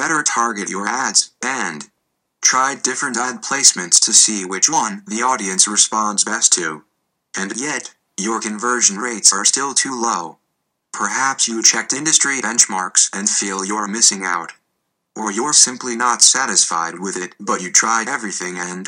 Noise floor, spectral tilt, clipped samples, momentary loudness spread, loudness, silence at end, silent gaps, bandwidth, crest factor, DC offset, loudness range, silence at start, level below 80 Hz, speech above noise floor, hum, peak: -73 dBFS; 0 dB/octave; under 0.1%; 13 LU; -15 LUFS; 0 s; none; over 20 kHz; 18 dB; under 0.1%; 3 LU; 0 s; -76 dBFS; 55 dB; none; 0 dBFS